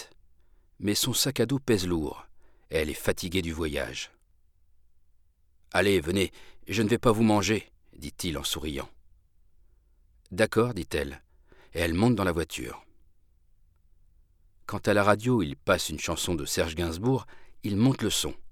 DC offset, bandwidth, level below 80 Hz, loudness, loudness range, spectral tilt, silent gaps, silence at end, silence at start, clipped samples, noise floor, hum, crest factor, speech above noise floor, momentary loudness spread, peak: under 0.1%; 18.5 kHz; -50 dBFS; -27 LUFS; 5 LU; -4.5 dB/octave; none; 0 s; 0 s; under 0.1%; -62 dBFS; none; 22 dB; 35 dB; 14 LU; -6 dBFS